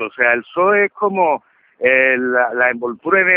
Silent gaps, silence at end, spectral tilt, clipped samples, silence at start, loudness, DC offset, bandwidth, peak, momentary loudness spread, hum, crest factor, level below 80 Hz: none; 0 s; -9.5 dB/octave; under 0.1%; 0 s; -15 LUFS; under 0.1%; 3.7 kHz; 0 dBFS; 5 LU; none; 16 dB; -66 dBFS